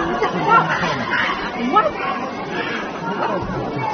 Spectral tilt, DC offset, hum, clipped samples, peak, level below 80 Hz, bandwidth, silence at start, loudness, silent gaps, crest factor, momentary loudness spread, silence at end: -3 dB/octave; under 0.1%; none; under 0.1%; -2 dBFS; -46 dBFS; 6.6 kHz; 0 s; -19 LUFS; none; 18 dB; 9 LU; 0 s